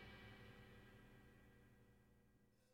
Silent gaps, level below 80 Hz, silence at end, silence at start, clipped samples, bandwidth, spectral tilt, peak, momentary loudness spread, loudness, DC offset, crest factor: none; -74 dBFS; 0 s; 0 s; under 0.1%; 16 kHz; -5.5 dB/octave; -50 dBFS; 8 LU; -64 LUFS; under 0.1%; 16 dB